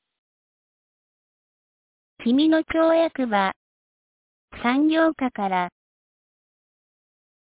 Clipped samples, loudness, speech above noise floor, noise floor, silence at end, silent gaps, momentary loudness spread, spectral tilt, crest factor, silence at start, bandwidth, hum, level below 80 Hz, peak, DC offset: under 0.1%; -22 LUFS; over 69 dB; under -90 dBFS; 1.75 s; 3.56-4.48 s; 8 LU; -9 dB/octave; 16 dB; 2.2 s; 4 kHz; none; -60 dBFS; -8 dBFS; under 0.1%